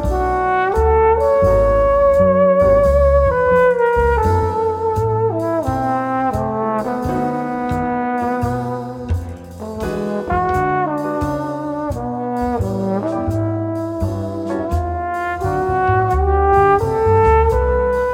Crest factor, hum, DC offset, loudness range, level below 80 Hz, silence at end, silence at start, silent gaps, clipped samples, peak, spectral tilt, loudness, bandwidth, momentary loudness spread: 14 dB; none; under 0.1%; 8 LU; -26 dBFS; 0 s; 0 s; none; under 0.1%; -2 dBFS; -8 dB/octave; -17 LUFS; 16 kHz; 10 LU